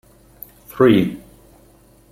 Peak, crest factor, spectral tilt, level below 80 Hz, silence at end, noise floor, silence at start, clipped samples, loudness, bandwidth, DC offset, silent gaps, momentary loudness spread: -2 dBFS; 18 dB; -7.5 dB/octave; -52 dBFS; 0.95 s; -51 dBFS; 0.75 s; under 0.1%; -16 LUFS; 16 kHz; under 0.1%; none; 26 LU